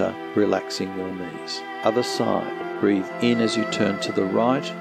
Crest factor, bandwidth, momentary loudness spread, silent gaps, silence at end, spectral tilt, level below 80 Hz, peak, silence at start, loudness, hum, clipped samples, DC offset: 18 dB; 15 kHz; 9 LU; none; 0 s; -5 dB/octave; -72 dBFS; -6 dBFS; 0 s; -24 LUFS; none; under 0.1%; under 0.1%